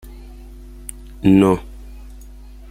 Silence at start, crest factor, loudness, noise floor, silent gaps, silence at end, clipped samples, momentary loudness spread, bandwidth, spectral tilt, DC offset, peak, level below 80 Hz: 0.05 s; 18 dB; -16 LUFS; -38 dBFS; none; 0.55 s; under 0.1%; 27 LU; 16 kHz; -7.5 dB/octave; under 0.1%; -2 dBFS; -36 dBFS